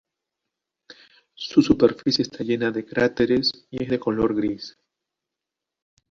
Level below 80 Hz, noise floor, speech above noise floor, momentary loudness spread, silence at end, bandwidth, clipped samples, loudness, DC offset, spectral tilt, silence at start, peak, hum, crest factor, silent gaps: -52 dBFS; -86 dBFS; 64 dB; 11 LU; 1.4 s; 7.6 kHz; under 0.1%; -22 LUFS; under 0.1%; -5.5 dB/octave; 1.4 s; -2 dBFS; none; 22 dB; none